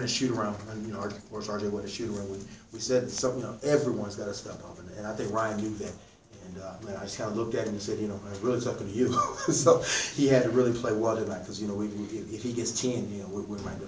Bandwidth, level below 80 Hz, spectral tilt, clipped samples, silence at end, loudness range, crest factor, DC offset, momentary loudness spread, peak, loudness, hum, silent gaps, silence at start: 8 kHz; -56 dBFS; -4.5 dB/octave; under 0.1%; 0 s; 8 LU; 22 dB; under 0.1%; 15 LU; -8 dBFS; -30 LUFS; none; none; 0 s